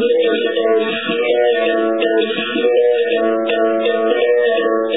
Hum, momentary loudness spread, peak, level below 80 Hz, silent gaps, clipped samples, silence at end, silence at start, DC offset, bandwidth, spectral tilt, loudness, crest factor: none; 3 LU; -2 dBFS; -72 dBFS; none; under 0.1%; 0 s; 0 s; 0.4%; 4 kHz; -7.5 dB/octave; -15 LUFS; 12 dB